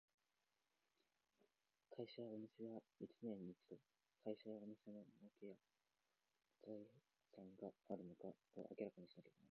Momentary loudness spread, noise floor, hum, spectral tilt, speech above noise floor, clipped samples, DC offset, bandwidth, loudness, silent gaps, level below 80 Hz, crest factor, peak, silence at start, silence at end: 12 LU; under -90 dBFS; none; -7 dB/octave; over 33 dB; under 0.1%; under 0.1%; 6.4 kHz; -58 LUFS; none; under -90 dBFS; 22 dB; -36 dBFS; 1.9 s; 0.05 s